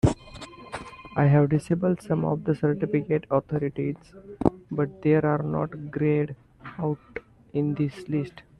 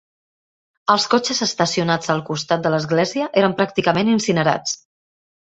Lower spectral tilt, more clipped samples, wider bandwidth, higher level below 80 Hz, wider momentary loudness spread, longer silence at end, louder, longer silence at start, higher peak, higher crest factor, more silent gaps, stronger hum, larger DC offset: first, -8.5 dB/octave vs -4.5 dB/octave; neither; first, 11 kHz vs 8.2 kHz; first, -50 dBFS vs -58 dBFS; first, 17 LU vs 5 LU; second, 0.2 s vs 0.65 s; second, -26 LUFS vs -19 LUFS; second, 0.05 s vs 0.85 s; second, -6 dBFS vs -2 dBFS; about the same, 20 dB vs 18 dB; neither; neither; neither